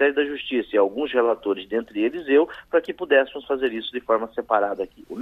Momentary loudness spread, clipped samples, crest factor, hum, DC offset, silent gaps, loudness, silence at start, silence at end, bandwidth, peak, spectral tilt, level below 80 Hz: 7 LU; under 0.1%; 20 dB; none; under 0.1%; none; -23 LUFS; 0 s; 0 s; 4.5 kHz; -4 dBFS; -6 dB/octave; -60 dBFS